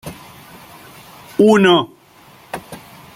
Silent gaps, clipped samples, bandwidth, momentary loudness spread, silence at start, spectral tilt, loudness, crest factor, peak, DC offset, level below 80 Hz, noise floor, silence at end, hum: none; under 0.1%; 16 kHz; 26 LU; 0.05 s; -5.5 dB/octave; -13 LUFS; 18 dB; -2 dBFS; under 0.1%; -56 dBFS; -46 dBFS; 0.4 s; none